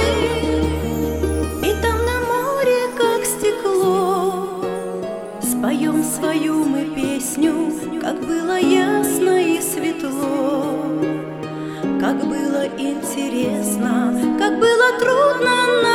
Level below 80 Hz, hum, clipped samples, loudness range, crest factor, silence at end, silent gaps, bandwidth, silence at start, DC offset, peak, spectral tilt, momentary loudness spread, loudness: -36 dBFS; none; under 0.1%; 4 LU; 16 dB; 0 s; none; 17 kHz; 0 s; under 0.1%; -2 dBFS; -4.5 dB/octave; 9 LU; -19 LUFS